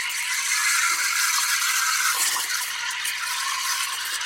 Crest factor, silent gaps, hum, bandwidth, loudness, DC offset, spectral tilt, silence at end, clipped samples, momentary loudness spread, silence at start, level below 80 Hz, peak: 16 dB; none; none; 16.5 kHz; -21 LUFS; under 0.1%; 4.5 dB/octave; 0 s; under 0.1%; 5 LU; 0 s; -68 dBFS; -8 dBFS